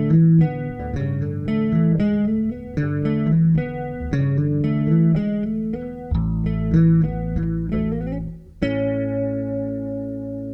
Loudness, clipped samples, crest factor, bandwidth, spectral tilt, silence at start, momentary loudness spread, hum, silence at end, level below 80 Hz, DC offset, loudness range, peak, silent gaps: -21 LUFS; under 0.1%; 14 dB; 5.6 kHz; -10.5 dB/octave; 0 s; 10 LU; none; 0 s; -34 dBFS; under 0.1%; 2 LU; -6 dBFS; none